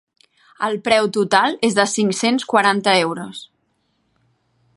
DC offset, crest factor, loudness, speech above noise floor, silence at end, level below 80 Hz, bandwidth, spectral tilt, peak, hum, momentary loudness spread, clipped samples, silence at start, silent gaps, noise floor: under 0.1%; 18 dB; -17 LUFS; 49 dB; 1.3 s; -66 dBFS; 11.5 kHz; -3.5 dB/octave; 0 dBFS; none; 10 LU; under 0.1%; 0.6 s; none; -67 dBFS